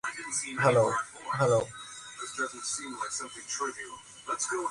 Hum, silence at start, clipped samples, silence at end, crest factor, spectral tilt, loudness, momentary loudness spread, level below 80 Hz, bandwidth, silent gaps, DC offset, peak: none; 0.05 s; under 0.1%; 0 s; 22 dB; -3.5 dB/octave; -30 LUFS; 16 LU; -66 dBFS; 11.5 kHz; none; under 0.1%; -10 dBFS